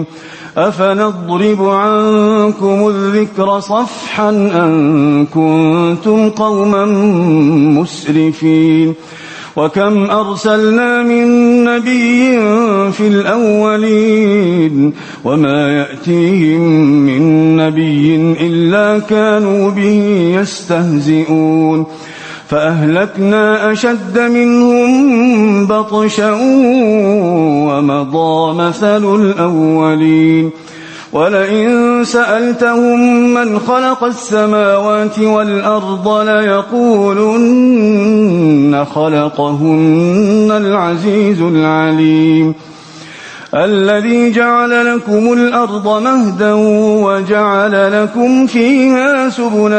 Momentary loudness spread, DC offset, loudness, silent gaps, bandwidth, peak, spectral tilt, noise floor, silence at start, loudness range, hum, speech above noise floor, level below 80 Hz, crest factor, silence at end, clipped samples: 5 LU; under 0.1%; -10 LUFS; none; 8.8 kHz; 0 dBFS; -6.5 dB/octave; -32 dBFS; 0 s; 2 LU; none; 22 dB; -54 dBFS; 10 dB; 0 s; under 0.1%